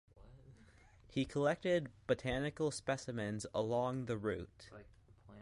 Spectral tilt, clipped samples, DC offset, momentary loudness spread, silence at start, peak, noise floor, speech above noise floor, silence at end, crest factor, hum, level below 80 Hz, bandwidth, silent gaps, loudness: -5.5 dB/octave; under 0.1%; under 0.1%; 11 LU; 0.15 s; -22 dBFS; -64 dBFS; 25 dB; 0 s; 18 dB; none; -62 dBFS; 11.5 kHz; none; -39 LUFS